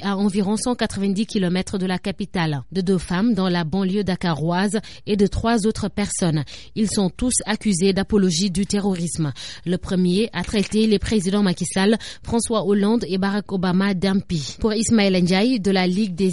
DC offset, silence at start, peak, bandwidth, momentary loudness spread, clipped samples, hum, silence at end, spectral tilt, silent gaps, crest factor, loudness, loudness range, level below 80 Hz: 0.7%; 0 s; -6 dBFS; 11.5 kHz; 6 LU; under 0.1%; none; 0 s; -5 dB/octave; none; 14 dB; -21 LUFS; 2 LU; -42 dBFS